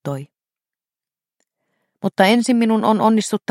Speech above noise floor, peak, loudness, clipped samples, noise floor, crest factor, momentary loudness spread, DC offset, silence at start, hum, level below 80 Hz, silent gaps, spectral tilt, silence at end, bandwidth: over 74 dB; 0 dBFS; -16 LUFS; under 0.1%; under -90 dBFS; 18 dB; 13 LU; under 0.1%; 0.05 s; none; -70 dBFS; none; -5 dB/octave; 0.1 s; 13.5 kHz